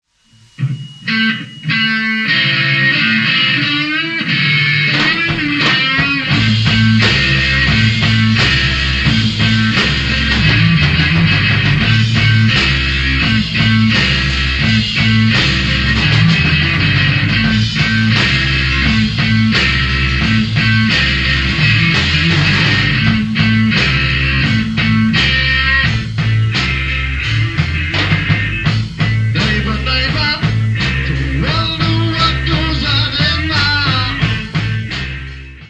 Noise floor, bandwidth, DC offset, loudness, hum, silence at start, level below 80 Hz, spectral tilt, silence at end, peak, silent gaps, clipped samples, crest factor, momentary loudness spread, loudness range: -48 dBFS; 8.6 kHz; under 0.1%; -12 LUFS; none; 0.6 s; -24 dBFS; -5 dB/octave; 0.05 s; 0 dBFS; none; under 0.1%; 14 dB; 5 LU; 3 LU